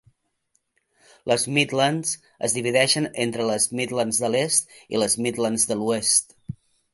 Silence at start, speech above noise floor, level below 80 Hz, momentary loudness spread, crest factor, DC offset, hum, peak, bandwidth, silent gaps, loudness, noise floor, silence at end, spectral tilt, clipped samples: 1.25 s; 48 dB; -62 dBFS; 9 LU; 22 dB; under 0.1%; none; -2 dBFS; 12 kHz; none; -22 LUFS; -71 dBFS; 0.4 s; -2.5 dB/octave; under 0.1%